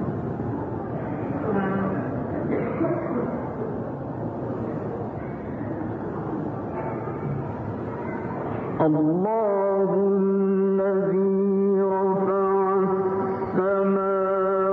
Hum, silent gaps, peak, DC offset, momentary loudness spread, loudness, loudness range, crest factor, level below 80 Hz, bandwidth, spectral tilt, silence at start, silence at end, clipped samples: none; none; -10 dBFS; under 0.1%; 9 LU; -25 LUFS; 9 LU; 14 dB; -52 dBFS; 3.5 kHz; -11.5 dB/octave; 0 s; 0 s; under 0.1%